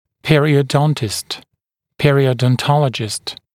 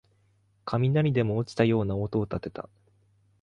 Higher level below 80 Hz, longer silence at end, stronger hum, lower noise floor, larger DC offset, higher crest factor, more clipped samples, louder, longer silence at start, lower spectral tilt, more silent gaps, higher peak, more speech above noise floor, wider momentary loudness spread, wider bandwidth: about the same, -48 dBFS vs -52 dBFS; second, 0.2 s vs 0.8 s; neither; first, -74 dBFS vs -66 dBFS; neither; about the same, 16 dB vs 18 dB; neither; first, -16 LUFS vs -27 LUFS; second, 0.25 s vs 0.65 s; second, -5.5 dB/octave vs -8.5 dB/octave; neither; first, 0 dBFS vs -10 dBFS; first, 59 dB vs 40 dB; second, 10 LU vs 17 LU; first, 15.5 kHz vs 9.8 kHz